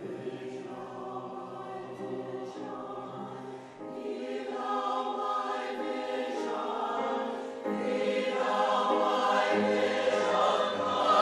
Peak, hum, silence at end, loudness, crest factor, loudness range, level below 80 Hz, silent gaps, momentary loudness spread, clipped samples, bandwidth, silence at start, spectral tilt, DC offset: -12 dBFS; none; 0 s; -31 LUFS; 20 dB; 12 LU; -80 dBFS; none; 14 LU; under 0.1%; 11.5 kHz; 0 s; -4.5 dB/octave; under 0.1%